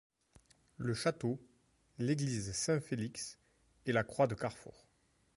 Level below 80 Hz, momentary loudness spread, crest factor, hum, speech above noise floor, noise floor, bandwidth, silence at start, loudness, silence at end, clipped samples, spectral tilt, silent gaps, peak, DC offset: -66 dBFS; 11 LU; 20 dB; none; 38 dB; -74 dBFS; 11.5 kHz; 0.8 s; -37 LUFS; 0.65 s; under 0.1%; -5 dB/octave; none; -18 dBFS; under 0.1%